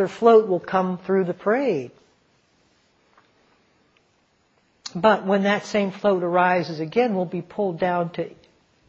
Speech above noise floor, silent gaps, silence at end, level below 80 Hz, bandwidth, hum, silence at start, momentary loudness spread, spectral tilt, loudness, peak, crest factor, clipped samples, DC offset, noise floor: 43 dB; none; 0.6 s; -66 dBFS; 7.8 kHz; none; 0 s; 12 LU; -6.5 dB/octave; -22 LUFS; -4 dBFS; 20 dB; under 0.1%; under 0.1%; -64 dBFS